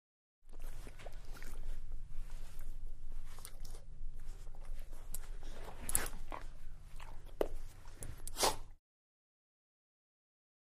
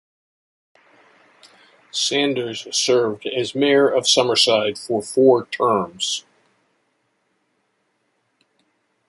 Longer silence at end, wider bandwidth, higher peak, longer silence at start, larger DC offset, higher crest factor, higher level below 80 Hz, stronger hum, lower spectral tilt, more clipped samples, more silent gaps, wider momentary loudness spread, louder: second, 2 s vs 2.9 s; first, 15 kHz vs 11.5 kHz; second, -10 dBFS vs -2 dBFS; second, 0.45 s vs 1.95 s; neither; first, 30 dB vs 20 dB; first, -44 dBFS vs -68 dBFS; neither; about the same, -2.5 dB/octave vs -3 dB/octave; neither; neither; first, 18 LU vs 9 LU; second, -45 LUFS vs -18 LUFS